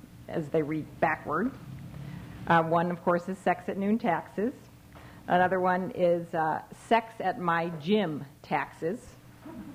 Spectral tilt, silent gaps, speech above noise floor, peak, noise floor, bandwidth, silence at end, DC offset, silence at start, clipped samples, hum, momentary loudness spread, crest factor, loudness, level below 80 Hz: -7 dB/octave; none; 22 dB; -10 dBFS; -50 dBFS; 16 kHz; 0 s; under 0.1%; 0.05 s; under 0.1%; none; 17 LU; 20 dB; -29 LUFS; -60 dBFS